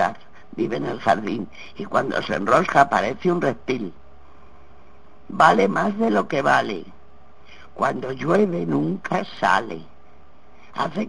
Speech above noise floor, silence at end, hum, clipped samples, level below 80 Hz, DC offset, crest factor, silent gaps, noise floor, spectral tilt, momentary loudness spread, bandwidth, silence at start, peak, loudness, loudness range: 31 dB; 0 s; none; under 0.1%; -54 dBFS; 1%; 22 dB; none; -52 dBFS; -6 dB/octave; 16 LU; 10 kHz; 0 s; 0 dBFS; -21 LUFS; 3 LU